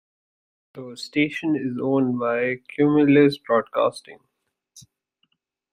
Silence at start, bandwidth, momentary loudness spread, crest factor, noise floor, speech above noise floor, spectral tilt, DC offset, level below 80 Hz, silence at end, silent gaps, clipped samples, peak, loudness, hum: 0.75 s; 10 kHz; 16 LU; 18 dB; -77 dBFS; 56 dB; -7 dB/octave; under 0.1%; -66 dBFS; 0.95 s; none; under 0.1%; -4 dBFS; -21 LUFS; none